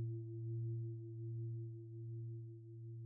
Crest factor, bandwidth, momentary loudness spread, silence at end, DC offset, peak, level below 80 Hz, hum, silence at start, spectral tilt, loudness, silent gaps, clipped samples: 10 dB; 0.7 kHz; 8 LU; 0 s; under 0.1%; -36 dBFS; -84 dBFS; none; 0 s; -19.5 dB/octave; -48 LUFS; none; under 0.1%